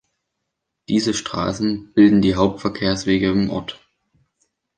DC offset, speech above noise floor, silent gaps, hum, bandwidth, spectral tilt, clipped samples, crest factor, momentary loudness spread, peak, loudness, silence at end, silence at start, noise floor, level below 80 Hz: under 0.1%; 60 dB; none; none; 9.8 kHz; -5.5 dB/octave; under 0.1%; 18 dB; 10 LU; -2 dBFS; -19 LUFS; 1 s; 0.9 s; -78 dBFS; -44 dBFS